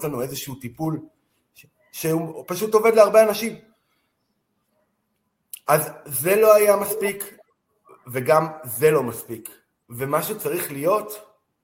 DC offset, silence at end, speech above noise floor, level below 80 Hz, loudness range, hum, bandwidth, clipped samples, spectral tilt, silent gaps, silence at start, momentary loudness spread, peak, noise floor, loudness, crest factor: under 0.1%; 0.4 s; 53 dB; -64 dBFS; 4 LU; none; 17 kHz; under 0.1%; -4.5 dB/octave; none; 0 s; 20 LU; -2 dBFS; -73 dBFS; -21 LUFS; 22 dB